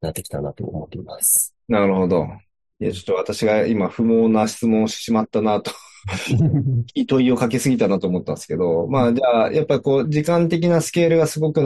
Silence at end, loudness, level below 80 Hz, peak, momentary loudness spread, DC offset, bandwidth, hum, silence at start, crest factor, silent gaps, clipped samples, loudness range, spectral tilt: 0 s; -19 LUFS; -52 dBFS; -4 dBFS; 11 LU; under 0.1%; 12.5 kHz; none; 0 s; 16 dB; none; under 0.1%; 2 LU; -5.5 dB/octave